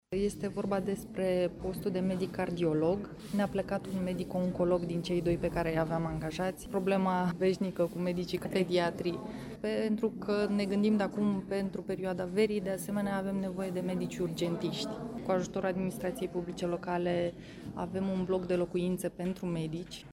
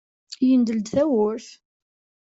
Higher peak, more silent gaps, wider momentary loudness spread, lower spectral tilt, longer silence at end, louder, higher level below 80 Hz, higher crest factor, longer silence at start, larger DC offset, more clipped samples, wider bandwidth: second, -16 dBFS vs -8 dBFS; neither; second, 7 LU vs 13 LU; about the same, -6.5 dB/octave vs -6.5 dB/octave; second, 0 s vs 0.75 s; second, -33 LUFS vs -21 LUFS; first, -56 dBFS vs -64 dBFS; about the same, 16 dB vs 14 dB; second, 0.1 s vs 0.3 s; neither; neither; first, 16 kHz vs 7.8 kHz